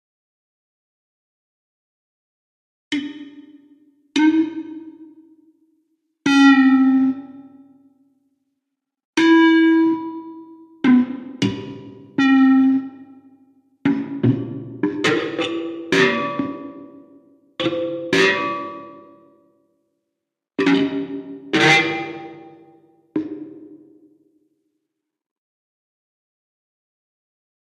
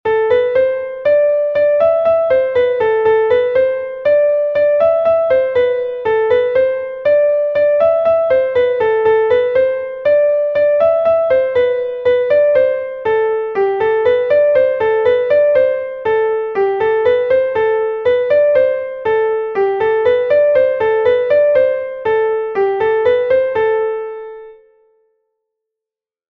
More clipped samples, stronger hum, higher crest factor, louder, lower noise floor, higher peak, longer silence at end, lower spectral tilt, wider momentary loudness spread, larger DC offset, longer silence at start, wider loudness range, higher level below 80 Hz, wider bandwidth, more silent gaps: neither; neither; first, 20 dB vs 12 dB; second, -18 LUFS vs -14 LUFS; second, -81 dBFS vs -87 dBFS; about the same, 0 dBFS vs -2 dBFS; first, 3.9 s vs 1.75 s; second, -5 dB/octave vs -6.5 dB/octave; first, 22 LU vs 5 LU; neither; first, 2.9 s vs 0.05 s; first, 17 LU vs 1 LU; second, -68 dBFS vs -52 dBFS; first, 9.6 kHz vs 4.9 kHz; first, 9.05-9.13 s vs none